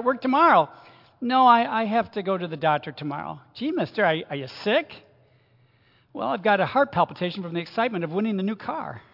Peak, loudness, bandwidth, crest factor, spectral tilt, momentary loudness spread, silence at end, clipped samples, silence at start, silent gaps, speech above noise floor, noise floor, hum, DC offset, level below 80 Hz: -4 dBFS; -24 LUFS; 5.8 kHz; 20 dB; -7.5 dB/octave; 15 LU; 0.15 s; under 0.1%; 0 s; none; 37 dB; -61 dBFS; none; under 0.1%; -70 dBFS